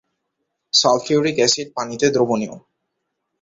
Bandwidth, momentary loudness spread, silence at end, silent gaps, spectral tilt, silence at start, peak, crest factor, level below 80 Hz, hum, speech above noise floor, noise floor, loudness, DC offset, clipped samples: 8 kHz; 9 LU; 0.85 s; none; -3 dB/octave; 0.75 s; -2 dBFS; 18 dB; -62 dBFS; none; 58 dB; -76 dBFS; -18 LUFS; under 0.1%; under 0.1%